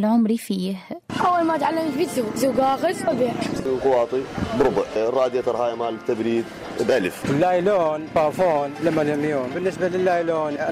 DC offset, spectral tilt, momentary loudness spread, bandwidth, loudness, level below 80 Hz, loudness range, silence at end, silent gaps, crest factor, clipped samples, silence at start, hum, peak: under 0.1%; -6 dB/octave; 6 LU; 16 kHz; -22 LUFS; -52 dBFS; 1 LU; 0 s; none; 12 dB; under 0.1%; 0 s; none; -8 dBFS